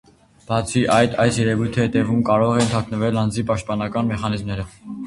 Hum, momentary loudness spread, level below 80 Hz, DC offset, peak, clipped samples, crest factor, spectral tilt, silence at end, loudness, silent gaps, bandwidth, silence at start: none; 8 LU; -44 dBFS; under 0.1%; -2 dBFS; under 0.1%; 18 dB; -6 dB/octave; 0 s; -20 LUFS; none; 11.5 kHz; 0.5 s